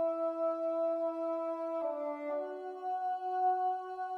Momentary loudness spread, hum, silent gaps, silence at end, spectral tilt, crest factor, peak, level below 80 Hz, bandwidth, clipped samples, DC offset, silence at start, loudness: 7 LU; none; none; 0 s; -4.5 dB/octave; 12 dB; -22 dBFS; -90 dBFS; 5.8 kHz; under 0.1%; under 0.1%; 0 s; -35 LUFS